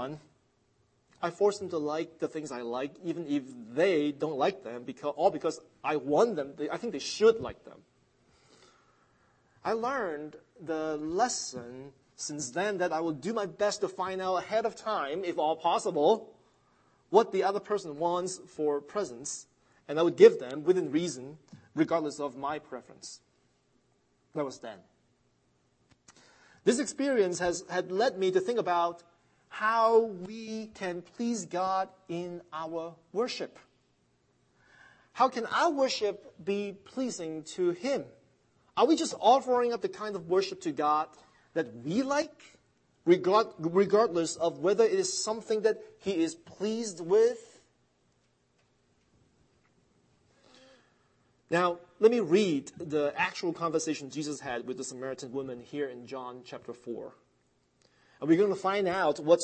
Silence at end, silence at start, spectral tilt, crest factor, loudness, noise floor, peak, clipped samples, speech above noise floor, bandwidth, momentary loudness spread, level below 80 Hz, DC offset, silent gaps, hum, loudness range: 0 s; 0 s; -4.5 dB/octave; 24 dB; -30 LUFS; -71 dBFS; -6 dBFS; under 0.1%; 42 dB; 8.8 kHz; 14 LU; -74 dBFS; under 0.1%; none; none; 9 LU